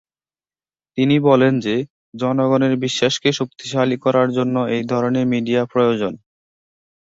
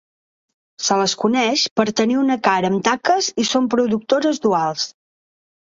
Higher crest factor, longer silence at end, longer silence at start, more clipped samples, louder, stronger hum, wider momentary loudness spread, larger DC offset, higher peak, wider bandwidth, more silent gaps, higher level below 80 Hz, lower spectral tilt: about the same, 16 dB vs 16 dB; about the same, 0.85 s vs 0.85 s; first, 0.95 s vs 0.8 s; neither; about the same, -18 LUFS vs -18 LUFS; neither; first, 9 LU vs 3 LU; neither; about the same, -2 dBFS vs -2 dBFS; about the same, 7.8 kHz vs 7.8 kHz; first, 1.90-2.12 s vs 1.71-1.76 s; about the same, -60 dBFS vs -62 dBFS; first, -6 dB/octave vs -3.5 dB/octave